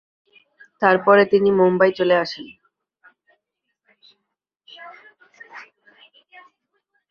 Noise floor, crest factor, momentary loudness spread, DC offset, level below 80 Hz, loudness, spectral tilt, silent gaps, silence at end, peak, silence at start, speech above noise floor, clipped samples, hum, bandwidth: -79 dBFS; 22 dB; 27 LU; under 0.1%; -66 dBFS; -17 LUFS; -7 dB/octave; none; 1.5 s; 0 dBFS; 0.8 s; 63 dB; under 0.1%; none; 6.6 kHz